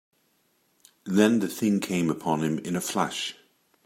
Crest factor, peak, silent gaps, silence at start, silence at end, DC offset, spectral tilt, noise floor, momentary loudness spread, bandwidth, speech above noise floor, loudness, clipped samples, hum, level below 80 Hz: 22 dB; -6 dBFS; none; 1.05 s; 0.55 s; under 0.1%; -5 dB/octave; -69 dBFS; 9 LU; 16 kHz; 44 dB; -26 LUFS; under 0.1%; none; -68 dBFS